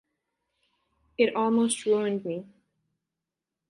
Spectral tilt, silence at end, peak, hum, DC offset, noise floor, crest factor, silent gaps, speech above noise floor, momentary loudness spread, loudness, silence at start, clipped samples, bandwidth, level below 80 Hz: -4.5 dB/octave; 1.25 s; -10 dBFS; none; under 0.1%; -87 dBFS; 20 dB; none; 62 dB; 13 LU; -26 LUFS; 1.2 s; under 0.1%; 11.5 kHz; -72 dBFS